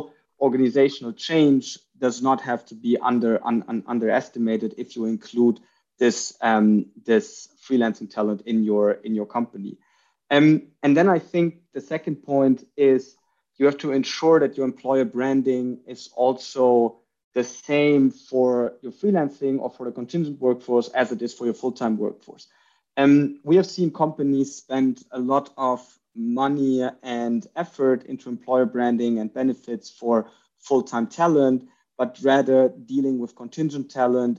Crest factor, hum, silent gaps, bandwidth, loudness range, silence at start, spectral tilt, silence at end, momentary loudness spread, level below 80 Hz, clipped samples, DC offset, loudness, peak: 18 dB; none; 17.24-17.32 s; 7.6 kHz; 3 LU; 0 s; -6 dB/octave; 0 s; 11 LU; -74 dBFS; under 0.1%; under 0.1%; -22 LUFS; -4 dBFS